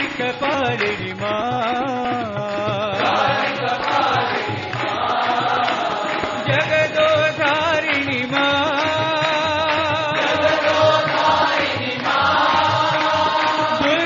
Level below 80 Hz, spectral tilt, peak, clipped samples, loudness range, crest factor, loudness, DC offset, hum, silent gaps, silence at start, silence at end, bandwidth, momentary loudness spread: -54 dBFS; -2 dB/octave; -2 dBFS; under 0.1%; 3 LU; 16 dB; -18 LUFS; under 0.1%; none; none; 0 s; 0 s; 7.2 kHz; 6 LU